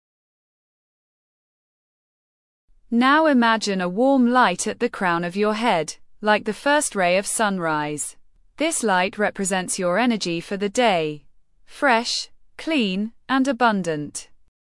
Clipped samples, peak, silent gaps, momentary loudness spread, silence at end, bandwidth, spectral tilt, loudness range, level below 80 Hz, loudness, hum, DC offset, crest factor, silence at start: under 0.1%; -4 dBFS; none; 10 LU; 0.4 s; 12 kHz; -3.5 dB/octave; 3 LU; -58 dBFS; -21 LUFS; none; under 0.1%; 18 dB; 2.9 s